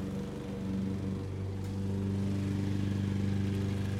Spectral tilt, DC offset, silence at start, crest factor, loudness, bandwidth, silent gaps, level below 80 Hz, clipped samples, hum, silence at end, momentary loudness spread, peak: -8 dB/octave; under 0.1%; 0 s; 12 dB; -34 LUFS; 12.5 kHz; none; -52 dBFS; under 0.1%; none; 0 s; 5 LU; -20 dBFS